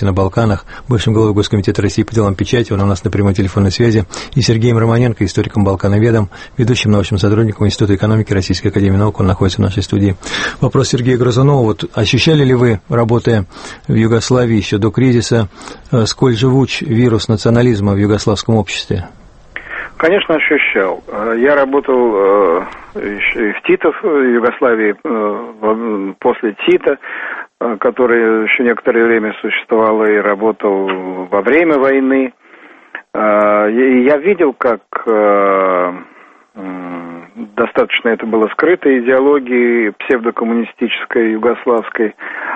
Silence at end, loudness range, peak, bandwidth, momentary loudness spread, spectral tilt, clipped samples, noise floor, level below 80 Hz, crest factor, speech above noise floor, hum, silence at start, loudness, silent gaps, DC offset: 0 s; 2 LU; 0 dBFS; 8.8 kHz; 9 LU; -6.5 dB/octave; under 0.1%; -40 dBFS; -38 dBFS; 12 dB; 28 dB; none; 0 s; -13 LUFS; none; under 0.1%